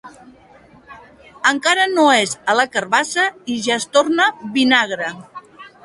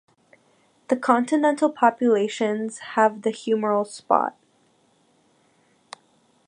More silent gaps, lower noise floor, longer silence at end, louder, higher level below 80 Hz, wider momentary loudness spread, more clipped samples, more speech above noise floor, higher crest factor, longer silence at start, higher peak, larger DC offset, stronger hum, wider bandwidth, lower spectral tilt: neither; second, -47 dBFS vs -63 dBFS; second, 0.15 s vs 2.15 s; first, -16 LUFS vs -22 LUFS; first, -62 dBFS vs -80 dBFS; about the same, 9 LU vs 8 LU; neither; second, 30 dB vs 41 dB; about the same, 18 dB vs 22 dB; second, 0.05 s vs 0.9 s; about the same, 0 dBFS vs -2 dBFS; neither; neither; about the same, 11.5 kHz vs 11 kHz; second, -2 dB/octave vs -5 dB/octave